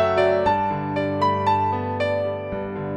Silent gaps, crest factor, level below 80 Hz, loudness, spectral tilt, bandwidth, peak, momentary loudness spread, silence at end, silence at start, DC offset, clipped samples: none; 14 dB; -50 dBFS; -22 LUFS; -7.5 dB/octave; 9.4 kHz; -6 dBFS; 9 LU; 0 s; 0 s; under 0.1%; under 0.1%